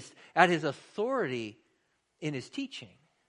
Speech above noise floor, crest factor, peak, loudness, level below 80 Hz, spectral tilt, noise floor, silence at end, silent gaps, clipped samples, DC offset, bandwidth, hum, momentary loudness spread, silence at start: 44 dB; 28 dB; -4 dBFS; -31 LUFS; -78 dBFS; -5 dB/octave; -75 dBFS; 0.45 s; none; under 0.1%; under 0.1%; 11 kHz; none; 15 LU; 0 s